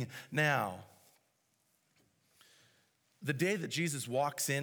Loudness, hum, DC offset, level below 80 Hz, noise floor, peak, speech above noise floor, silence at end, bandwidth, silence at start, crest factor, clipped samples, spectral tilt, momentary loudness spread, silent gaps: -34 LUFS; none; under 0.1%; -86 dBFS; -77 dBFS; -16 dBFS; 42 dB; 0 s; over 20 kHz; 0 s; 20 dB; under 0.1%; -4 dB/octave; 9 LU; none